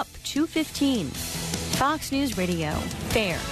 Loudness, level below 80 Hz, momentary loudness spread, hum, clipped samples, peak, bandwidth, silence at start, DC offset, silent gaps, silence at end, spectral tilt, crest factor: -26 LUFS; -42 dBFS; 5 LU; none; under 0.1%; -10 dBFS; 13.5 kHz; 0 s; under 0.1%; none; 0 s; -4 dB/octave; 16 dB